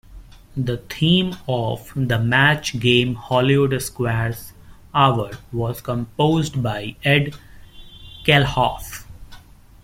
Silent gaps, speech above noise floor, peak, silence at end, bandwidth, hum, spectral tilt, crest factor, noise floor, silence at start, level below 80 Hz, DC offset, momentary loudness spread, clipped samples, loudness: none; 24 dB; -2 dBFS; 0.45 s; 16.5 kHz; none; -5.5 dB/octave; 20 dB; -44 dBFS; 0.1 s; -44 dBFS; under 0.1%; 11 LU; under 0.1%; -20 LUFS